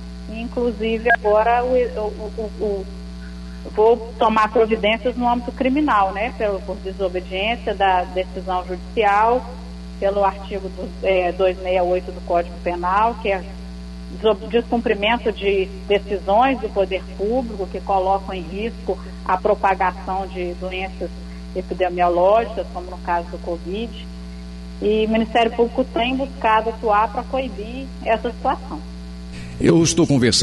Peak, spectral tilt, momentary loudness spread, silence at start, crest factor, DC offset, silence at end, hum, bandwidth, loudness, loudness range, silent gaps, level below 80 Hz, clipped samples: -6 dBFS; -5 dB/octave; 14 LU; 0 s; 16 dB; under 0.1%; 0 s; 60 Hz at -35 dBFS; 11.5 kHz; -20 LUFS; 3 LU; none; -36 dBFS; under 0.1%